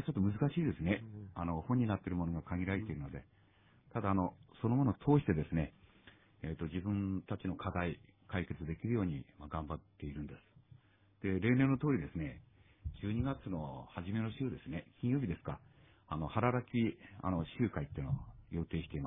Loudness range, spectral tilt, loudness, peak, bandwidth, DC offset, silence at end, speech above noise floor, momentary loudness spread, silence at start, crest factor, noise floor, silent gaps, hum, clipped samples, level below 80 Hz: 4 LU; -6.5 dB/octave; -38 LUFS; -16 dBFS; 3.8 kHz; under 0.1%; 0 s; 29 dB; 13 LU; 0 s; 20 dB; -66 dBFS; none; none; under 0.1%; -56 dBFS